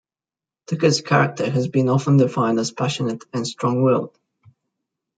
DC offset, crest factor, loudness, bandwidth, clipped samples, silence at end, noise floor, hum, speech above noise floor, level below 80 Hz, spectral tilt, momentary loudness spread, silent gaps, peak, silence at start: under 0.1%; 18 dB; -20 LUFS; 9.2 kHz; under 0.1%; 1.1 s; under -90 dBFS; none; over 71 dB; -64 dBFS; -6 dB/octave; 9 LU; none; -4 dBFS; 0.7 s